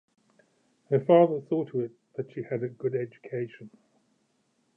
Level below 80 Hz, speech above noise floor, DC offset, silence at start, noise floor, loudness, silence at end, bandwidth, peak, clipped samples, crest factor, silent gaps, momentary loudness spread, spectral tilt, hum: -82 dBFS; 45 dB; under 0.1%; 0.9 s; -72 dBFS; -28 LUFS; 1.1 s; 3.5 kHz; -8 dBFS; under 0.1%; 22 dB; none; 16 LU; -10 dB/octave; none